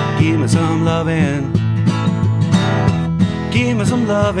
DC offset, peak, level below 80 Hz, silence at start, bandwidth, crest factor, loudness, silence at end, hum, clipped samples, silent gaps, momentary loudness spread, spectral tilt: under 0.1%; -2 dBFS; -38 dBFS; 0 s; 10.5 kHz; 12 dB; -16 LUFS; 0 s; none; under 0.1%; none; 2 LU; -7 dB/octave